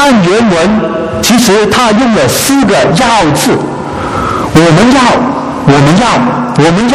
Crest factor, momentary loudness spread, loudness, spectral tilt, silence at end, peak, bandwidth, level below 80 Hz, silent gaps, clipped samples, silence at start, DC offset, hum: 8 dB; 7 LU; -7 LUFS; -5 dB/octave; 0 s; 0 dBFS; 16 kHz; -32 dBFS; none; 0.9%; 0 s; under 0.1%; none